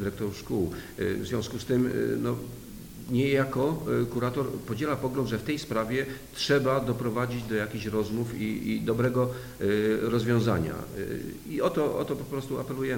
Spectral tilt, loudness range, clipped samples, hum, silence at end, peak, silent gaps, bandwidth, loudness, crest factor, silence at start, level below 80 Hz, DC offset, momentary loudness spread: -6.5 dB/octave; 1 LU; under 0.1%; none; 0 s; -12 dBFS; none; 17.5 kHz; -29 LUFS; 18 dB; 0 s; -52 dBFS; under 0.1%; 9 LU